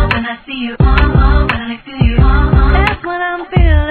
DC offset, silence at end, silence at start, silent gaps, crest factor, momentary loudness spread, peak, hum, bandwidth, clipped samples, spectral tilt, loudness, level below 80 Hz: under 0.1%; 0 s; 0 s; none; 10 dB; 10 LU; 0 dBFS; none; 4.5 kHz; 0.2%; -10 dB/octave; -13 LUFS; -12 dBFS